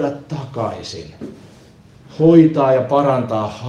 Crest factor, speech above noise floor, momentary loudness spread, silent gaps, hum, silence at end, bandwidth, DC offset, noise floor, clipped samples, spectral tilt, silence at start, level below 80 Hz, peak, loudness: 16 dB; 29 dB; 22 LU; none; none; 0 s; 7.8 kHz; under 0.1%; -45 dBFS; under 0.1%; -8 dB/octave; 0 s; -52 dBFS; 0 dBFS; -15 LUFS